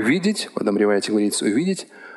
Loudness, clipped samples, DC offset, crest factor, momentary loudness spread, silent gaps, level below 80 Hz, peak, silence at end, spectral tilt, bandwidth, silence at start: -21 LUFS; under 0.1%; under 0.1%; 16 dB; 5 LU; none; -72 dBFS; -6 dBFS; 0 s; -4.5 dB/octave; 12.5 kHz; 0 s